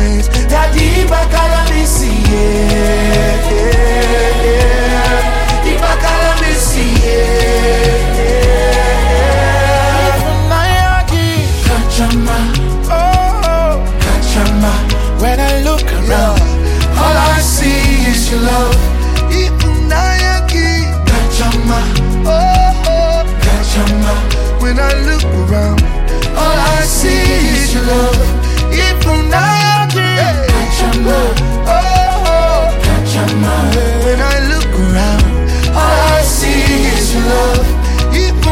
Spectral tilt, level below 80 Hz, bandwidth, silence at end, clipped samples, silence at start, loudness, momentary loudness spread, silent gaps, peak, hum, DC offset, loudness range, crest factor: -5 dB/octave; -12 dBFS; 16.5 kHz; 0 s; under 0.1%; 0 s; -12 LUFS; 3 LU; none; 0 dBFS; none; under 0.1%; 1 LU; 10 dB